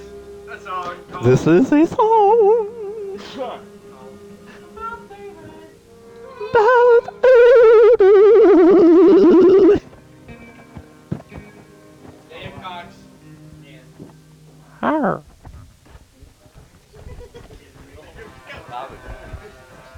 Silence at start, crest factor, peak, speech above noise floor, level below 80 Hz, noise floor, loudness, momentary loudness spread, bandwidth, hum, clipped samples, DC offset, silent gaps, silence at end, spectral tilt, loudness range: 0.15 s; 12 dB; -6 dBFS; 33 dB; -48 dBFS; -47 dBFS; -12 LUFS; 25 LU; 8.4 kHz; none; under 0.1%; under 0.1%; none; 0.6 s; -7.5 dB/octave; 25 LU